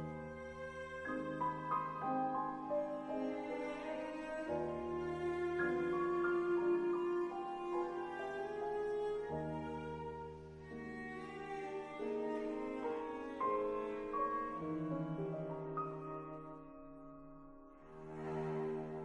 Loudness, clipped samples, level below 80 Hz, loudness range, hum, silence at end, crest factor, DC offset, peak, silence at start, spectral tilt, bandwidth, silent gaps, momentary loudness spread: -41 LUFS; under 0.1%; -66 dBFS; 7 LU; none; 0 s; 16 dB; under 0.1%; -26 dBFS; 0 s; -7.5 dB/octave; 9.6 kHz; none; 13 LU